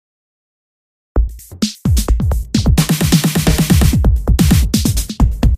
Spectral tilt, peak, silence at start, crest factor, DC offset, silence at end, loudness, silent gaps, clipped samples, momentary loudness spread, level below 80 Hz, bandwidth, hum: -5.5 dB/octave; 0 dBFS; 1.15 s; 14 dB; under 0.1%; 0 s; -15 LUFS; none; under 0.1%; 8 LU; -18 dBFS; 16 kHz; none